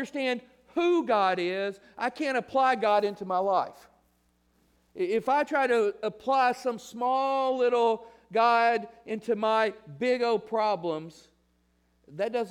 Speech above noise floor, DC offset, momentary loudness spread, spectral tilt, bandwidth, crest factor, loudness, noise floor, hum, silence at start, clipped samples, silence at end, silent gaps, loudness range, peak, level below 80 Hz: 42 dB; under 0.1%; 10 LU; -5 dB/octave; 13.5 kHz; 18 dB; -27 LUFS; -69 dBFS; none; 0 s; under 0.1%; 0 s; none; 3 LU; -10 dBFS; -72 dBFS